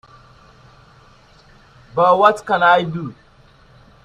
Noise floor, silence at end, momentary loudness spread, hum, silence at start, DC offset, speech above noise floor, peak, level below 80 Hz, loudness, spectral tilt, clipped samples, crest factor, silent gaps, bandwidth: -49 dBFS; 0.95 s; 16 LU; none; 1.95 s; under 0.1%; 35 dB; 0 dBFS; -54 dBFS; -15 LUFS; -5.5 dB/octave; under 0.1%; 20 dB; none; 10.5 kHz